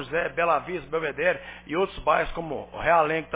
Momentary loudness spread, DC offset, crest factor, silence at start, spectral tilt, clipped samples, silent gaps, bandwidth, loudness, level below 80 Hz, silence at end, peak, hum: 10 LU; under 0.1%; 18 dB; 0 s; -9 dB/octave; under 0.1%; none; 4 kHz; -26 LUFS; -48 dBFS; 0 s; -8 dBFS; none